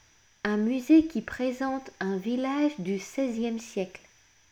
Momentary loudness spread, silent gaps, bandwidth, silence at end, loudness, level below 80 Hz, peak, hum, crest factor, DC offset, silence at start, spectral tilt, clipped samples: 12 LU; none; 14 kHz; 0.55 s; -28 LUFS; -62 dBFS; -10 dBFS; none; 18 dB; under 0.1%; 0.45 s; -6 dB/octave; under 0.1%